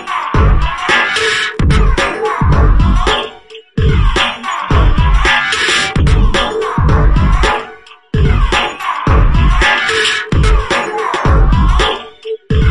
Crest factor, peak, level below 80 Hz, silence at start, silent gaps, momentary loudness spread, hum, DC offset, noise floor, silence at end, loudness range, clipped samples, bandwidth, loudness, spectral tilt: 10 dB; 0 dBFS; -14 dBFS; 0 s; none; 6 LU; none; under 0.1%; -34 dBFS; 0 s; 1 LU; under 0.1%; 11.5 kHz; -12 LUFS; -5 dB/octave